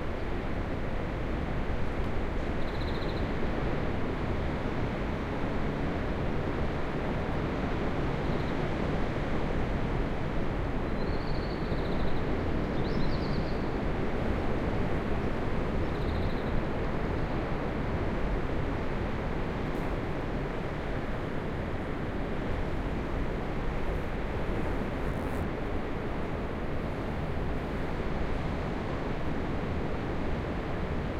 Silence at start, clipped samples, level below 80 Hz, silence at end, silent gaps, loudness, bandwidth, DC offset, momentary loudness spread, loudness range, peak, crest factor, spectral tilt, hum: 0 s; under 0.1%; -36 dBFS; 0 s; none; -33 LUFS; 8.4 kHz; under 0.1%; 3 LU; 2 LU; -16 dBFS; 14 dB; -7.5 dB/octave; none